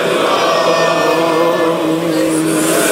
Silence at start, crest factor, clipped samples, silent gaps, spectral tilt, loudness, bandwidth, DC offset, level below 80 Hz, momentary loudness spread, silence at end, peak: 0 s; 12 dB; under 0.1%; none; -3.5 dB/octave; -13 LUFS; 16.5 kHz; under 0.1%; -58 dBFS; 2 LU; 0 s; 0 dBFS